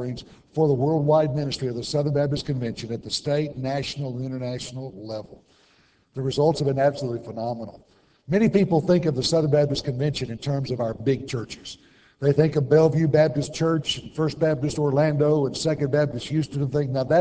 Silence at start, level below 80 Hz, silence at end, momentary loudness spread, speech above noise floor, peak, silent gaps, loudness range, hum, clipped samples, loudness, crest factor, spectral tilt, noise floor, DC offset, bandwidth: 0 s; -52 dBFS; 0 s; 13 LU; 38 dB; -6 dBFS; none; 6 LU; none; under 0.1%; -23 LUFS; 18 dB; -6.5 dB/octave; -61 dBFS; under 0.1%; 8 kHz